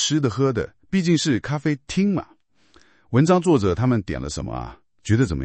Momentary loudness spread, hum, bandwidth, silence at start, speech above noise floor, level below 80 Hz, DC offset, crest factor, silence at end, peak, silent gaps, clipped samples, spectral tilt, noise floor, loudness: 12 LU; none; 8.8 kHz; 0 s; 37 dB; -44 dBFS; under 0.1%; 20 dB; 0 s; -2 dBFS; none; under 0.1%; -6 dB/octave; -57 dBFS; -22 LUFS